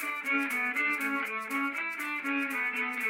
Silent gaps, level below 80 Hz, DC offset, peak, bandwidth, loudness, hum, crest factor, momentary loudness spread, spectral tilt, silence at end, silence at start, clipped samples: none; -80 dBFS; under 0.1%; -18 dBFS; 16 kHz; -30 LUFS; none; 14 dB; 4 LU; -2 dB/octave; 0 s; 0 s; under 0.1%